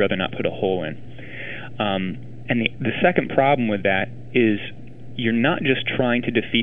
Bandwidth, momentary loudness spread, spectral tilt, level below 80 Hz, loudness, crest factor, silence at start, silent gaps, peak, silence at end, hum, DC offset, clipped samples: 4 kHz; 15 LU; -9 dB/octave; -52 dBFS; -22 LUFS; 22 dB; 0 s; none; 0 dBFS; 0 s; none; 2%; under 0.1%